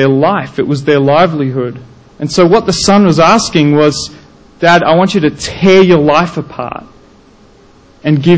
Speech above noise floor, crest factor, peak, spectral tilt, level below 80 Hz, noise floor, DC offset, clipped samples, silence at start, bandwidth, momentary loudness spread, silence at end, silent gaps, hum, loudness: 33 dB; 10 dB; 0 dBFS; -5.5 dB/octave; -40 dBFS; -42 dBFS; under 0.1%; 0.2%; 0 s; 8 kHz; 14 LU; 0 s; none; none; -9 LUFS